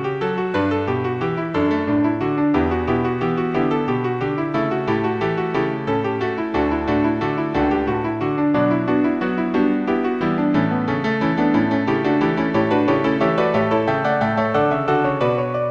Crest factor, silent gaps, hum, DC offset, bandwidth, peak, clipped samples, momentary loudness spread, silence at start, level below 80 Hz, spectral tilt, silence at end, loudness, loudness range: 14 dB; none; none; 0.2%; 6.8 kHz; -4 dBFS; under 0.1%; 4 LU; 0 s; -44 dBFS; -8.5 dB/octave; 0 s; -20 LUFS; 3 LU